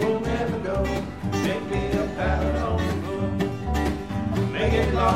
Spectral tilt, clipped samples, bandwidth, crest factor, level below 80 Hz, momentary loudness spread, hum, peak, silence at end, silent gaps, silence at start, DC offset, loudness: -6.5 dB/octave; under 0.1%; 15.5 kHz; 16 dB; -32 dBFS; 5 LU; none; -8 dBFS; 0 s; none; 0 s; 0.4%; -25 LUFS